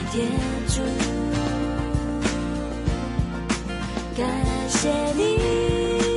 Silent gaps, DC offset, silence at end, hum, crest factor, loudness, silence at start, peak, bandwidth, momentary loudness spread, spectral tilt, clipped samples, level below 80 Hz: none; under 0.1%; 0 s; none; 14 dB; -24 LUFS; 0 s; -8 dBFS; 11.5 kHz; 6 LU; -5 dB/octave; under 0.1%; -32 dBFS